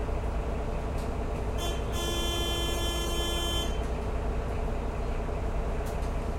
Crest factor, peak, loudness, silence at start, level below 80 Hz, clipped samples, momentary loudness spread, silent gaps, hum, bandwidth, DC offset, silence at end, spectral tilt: 12 dB; -16 dBFS; -32 LUFS; 0 s; -32 dBFS; under 0.1%; 4 LU; none; none; 16.5 kHz; under 0.1%; 0 s; -4.5 dB/octave